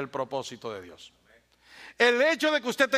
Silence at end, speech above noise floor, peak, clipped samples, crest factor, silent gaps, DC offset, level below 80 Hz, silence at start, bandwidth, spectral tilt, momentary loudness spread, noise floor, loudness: 0 s; 34 dB; -6 dBFS; under 0.1%; 22 dB; none; under 0.1%; -72 dBFS; 0 s; 15.5 kHz; -3 dB/octave; 21 LU; -61 dBFS; -25 LUFS